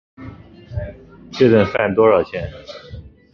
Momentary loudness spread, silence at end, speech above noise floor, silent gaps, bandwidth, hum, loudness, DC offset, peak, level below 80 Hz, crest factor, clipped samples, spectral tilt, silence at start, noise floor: 24 LU; 0.35 s; 21 dB; none; 6.6 kHz; none; -16 LUFS; under 0.1%; -2 dBFS; -40 dBFS; 16 dB; under 0.1%; -8 dB/octave; 0.2 s; -38 dBFS